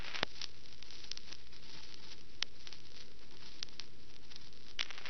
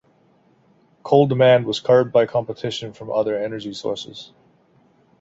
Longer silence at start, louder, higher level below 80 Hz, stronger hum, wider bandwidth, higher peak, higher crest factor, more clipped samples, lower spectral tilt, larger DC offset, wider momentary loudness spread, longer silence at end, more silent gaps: second, 0 s vs 1.05 s; second, -47 LUFS vs -19 LUFS; second, -66 dBFS vs -60 dBFS; neither; first, 15.5 kHz vs 7.8 kHz; second, -8 dBFS vs 0 dBFS; first, 40 dB vs 20 dB; neither; second, -2 dB/octave vs -6.5 dB/octave; first, 2% vs under 0.1%; about the same, 14 LU vs 15 LU; second, 0 s vs 0.95 s; neither